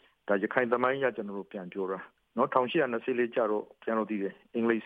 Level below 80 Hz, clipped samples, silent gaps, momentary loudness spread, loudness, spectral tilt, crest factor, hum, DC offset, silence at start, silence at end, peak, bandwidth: -80 dBFS; under 0.1%; none; 12 LU; -31 LUFS; -8.5 dB/octave; 22 dB; none; under 0.1%; 0.25 s; 0 s; -8 dBFS; 4.6 kHz